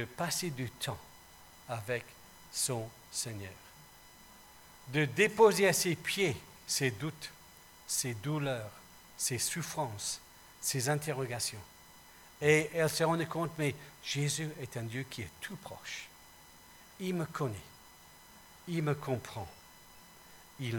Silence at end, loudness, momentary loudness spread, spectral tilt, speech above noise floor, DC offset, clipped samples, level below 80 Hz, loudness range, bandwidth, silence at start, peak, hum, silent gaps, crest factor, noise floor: 0 s; -34 LUFS; 26 LU; -4 dB/octave; 23 dB; under 0.1%; under 0.1%; -68 dBFS; 10 LU; 19 kHz; 0 s; -12 dBFS; none; none; 24 dB; -57 dBFS